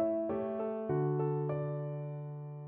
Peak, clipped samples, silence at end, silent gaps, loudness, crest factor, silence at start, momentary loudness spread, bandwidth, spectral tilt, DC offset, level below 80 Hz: -22 dBFS; under 0.1%; 0 s; none; -36 LUFS; 14 dB; 0 s; 9 LU; 3.3 kHz; -10.5 dB/octave; under 0.1%; -70 dBFS